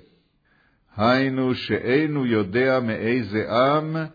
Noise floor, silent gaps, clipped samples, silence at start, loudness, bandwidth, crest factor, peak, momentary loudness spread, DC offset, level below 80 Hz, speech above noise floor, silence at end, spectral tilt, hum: -63 dBFS; none; under 0.1%; 0.95 s; -22 LUFS; 5 kHz; 16 dB; -6 dBFS; 4 LU; under 0.1%; -60 dBFS; 41 dB; 0.05 s; -8 dB/octave; none